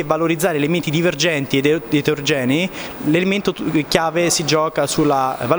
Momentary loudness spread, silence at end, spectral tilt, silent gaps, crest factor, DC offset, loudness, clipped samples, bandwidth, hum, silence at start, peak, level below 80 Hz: 3 LU; 0 s; -4.5 dB/octave; none; 18 dB; under 0.1%; -18 LUFS; under 0.1%; over 20 kHz; none; 0 s; 0 dBFS; -50 dBFS